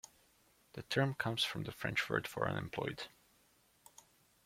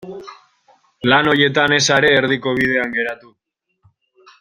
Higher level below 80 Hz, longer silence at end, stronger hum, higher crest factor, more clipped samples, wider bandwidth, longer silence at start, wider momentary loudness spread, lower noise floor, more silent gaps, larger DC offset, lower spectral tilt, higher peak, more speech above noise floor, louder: second, -68 dBFS vs -54 dBFS; first, 1.4 s vs 1.25 s; neither; first, 24 dB vs 18 dB; neither; about the same, 16.5 kHz vs 16 kHz; about the same, 0.05 s vs 0.05 s; about the same, 16 LU vs 16 LU; first, -71 dBFS vs -62 dBFS; neither; neither; about the same, -4.5 dB/octave vs -3.5 dB/octave; second, -18 dBFS vs 0 dBFS; second, 33 dB vs 47 dB; second, -38 LUFS vs -15 LUFS